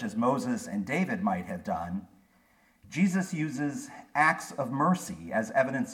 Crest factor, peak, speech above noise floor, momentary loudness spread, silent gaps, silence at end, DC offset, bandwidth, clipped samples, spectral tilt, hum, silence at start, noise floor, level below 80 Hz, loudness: 20 dB; -10 dBFS; 35 dB; 9 LU; none; 0 s; under 0.1%; 15 kHz; under 0.1%; -6 dB/octave; none; 0 s; -65 dBFS; -66 dBFS; -30 LUFS